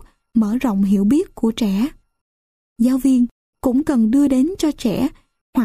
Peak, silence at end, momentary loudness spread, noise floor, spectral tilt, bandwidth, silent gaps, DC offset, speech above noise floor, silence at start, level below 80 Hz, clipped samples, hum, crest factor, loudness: -6 dBFS; 0 s; 8 LU; under -90 dBFS; -6.5 dB/octave; 15 kHz; 2.21-2.76 s, 3.31-3.53 s, 5.41-5.53 s; under 0.1%; over 73 dB; 0.35 s; -44 dBFS; under 0.1%; none; 12 dB; -18 LUFS